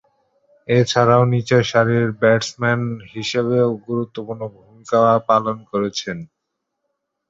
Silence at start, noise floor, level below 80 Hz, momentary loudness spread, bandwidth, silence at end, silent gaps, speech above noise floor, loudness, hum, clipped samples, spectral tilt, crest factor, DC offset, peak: 0.7 s; -77 dBFS; -56 dBFS; 14 LU; 7.8 kHz; 1.05 s; none; 60 dB; -18 LUFS; none; under 0.1%; -6 dB/octave; 18 dB; under 0.1%; -2 dBFS